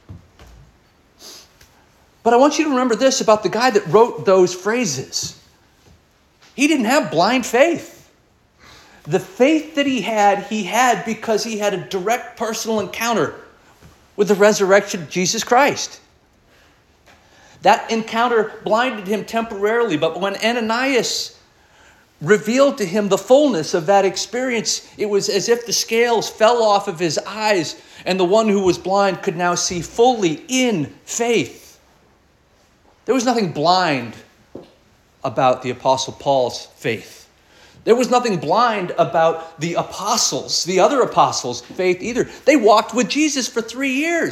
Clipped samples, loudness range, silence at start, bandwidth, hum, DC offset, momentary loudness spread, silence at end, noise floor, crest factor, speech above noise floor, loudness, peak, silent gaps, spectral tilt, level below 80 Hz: under 0.1%; 4 LU; 0.1 s; 16.5 kHz; none; under 0.1%; 9 LU; 0 s; -56 dBFS; 18 dB; 39 dB; -18 LUFS; -2 dBFS; none; -3.5 dB/octave; -58 dBFS